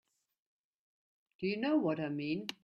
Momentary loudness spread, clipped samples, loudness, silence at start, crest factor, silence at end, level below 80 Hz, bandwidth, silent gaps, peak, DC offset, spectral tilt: 6 LU; under 0.1%; -35 LUFS; 1.4 s; 18 dB; 0.1 s; -78 dBFS; 10.5 kHz; none; -20 dBFS; under 0.1%; -6.5 dB/octave